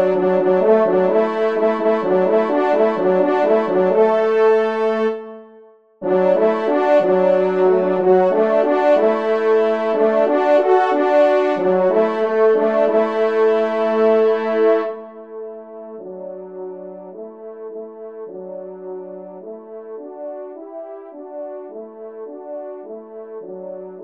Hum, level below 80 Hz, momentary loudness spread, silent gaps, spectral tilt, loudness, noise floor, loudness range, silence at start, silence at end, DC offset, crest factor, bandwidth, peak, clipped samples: none; -70 dBFS; 19 LU; none; -7.5 dB/octave; -16 LUFS; -47 dBFS; 17 LU; 0 s; 0 s; 0.3%; 16 dB; 7 kHz; -2 dBFS; under 0.1%